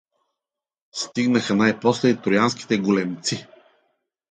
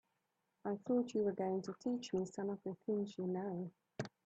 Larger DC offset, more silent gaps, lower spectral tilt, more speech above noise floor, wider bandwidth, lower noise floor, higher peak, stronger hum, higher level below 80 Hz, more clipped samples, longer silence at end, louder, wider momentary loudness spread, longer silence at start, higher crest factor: neither; neither; second, -5 dB/octave vs -7 dB/octave; first, 68 dB vs 45 dB; first, 9.4 kHz vs 8.4 kHz; about the same, -88 dBFS vs -85 dBFS; first, -4 dBFS vs -26 dBFS; neither; first, -64 dBFS vs -80 dBFS; neither; first, 0.9 s vs 0.15 s; first, -21 LUFS vs -41 LUFS; about the same, 10 LU vs 10 LU; first, 0.95 s vs 0.65 s; about the same, 18 dB vs 16 dB